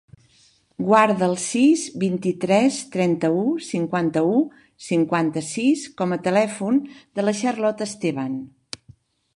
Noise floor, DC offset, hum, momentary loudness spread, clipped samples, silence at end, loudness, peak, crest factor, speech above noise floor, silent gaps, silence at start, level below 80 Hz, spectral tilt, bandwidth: -58 dBFS; under 0.1%; none; 11 LU; under 0.1%; 0.9 s; -21 LUFS; -2 dBFS; 20 dB; 37 dB; none; 0.8 s; -66 dBFS; -5.5 dB/octave; 11.5 kHz